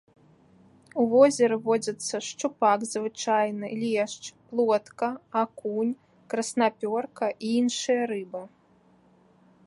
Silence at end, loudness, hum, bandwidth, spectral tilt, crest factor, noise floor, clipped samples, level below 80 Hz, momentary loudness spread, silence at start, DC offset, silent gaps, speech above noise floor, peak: 1.2 s; -26 LUFS; none; 11.5 kHz; -4 dB/octave; 22 dB; -61 dBFS; under 0.1%; -76 dBFS; 10 LU; 0.95 s; under 0.1%; none; 35 dB; -6 dBFS